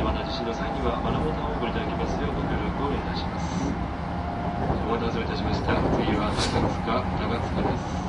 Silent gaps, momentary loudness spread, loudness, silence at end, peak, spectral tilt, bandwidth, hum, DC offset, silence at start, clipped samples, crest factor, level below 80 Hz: none; 5 LU; -27 LUFS; 0 s; -10 dBFS; -6.5 dB/octave; 11.5 kHz; none; under 0.1%; 0 s; under 0.1%; 18 dB; -34 dBFS